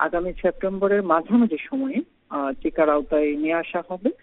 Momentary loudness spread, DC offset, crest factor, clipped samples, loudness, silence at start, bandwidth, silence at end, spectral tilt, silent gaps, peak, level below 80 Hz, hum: 8 LU; under 0.1%; 20 dB; under 0.1%; -23 LUFS; 0 s; 4 kHz; 0.1 s; -5.5 dB/octave; none; -4 dBFS; -46 dBFS; none